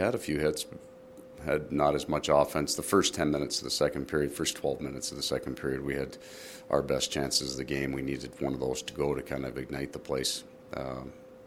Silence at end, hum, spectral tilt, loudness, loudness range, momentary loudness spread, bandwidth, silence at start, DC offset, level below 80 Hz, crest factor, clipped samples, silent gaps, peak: 0 s; none; -4 dB/octave; -31 LUFS; 5 LU; 14 LU; 17 kHz; 0 s; under 0.1%; -52 dBFS; 22 dB; under 0.1%; none; -10 dBFS